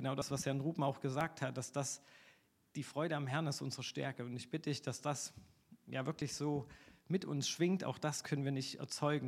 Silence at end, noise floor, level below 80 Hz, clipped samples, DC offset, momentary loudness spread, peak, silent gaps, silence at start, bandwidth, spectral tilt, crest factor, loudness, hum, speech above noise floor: 0 s; -70 dBFS; -74 dBFS; under 0.1%; under 0.1%; 6 LU; -20 dBFS; none; 0 s; 15 kHz; -5 dB/octave; 20 dB; -40 LUFS; none; 30 dB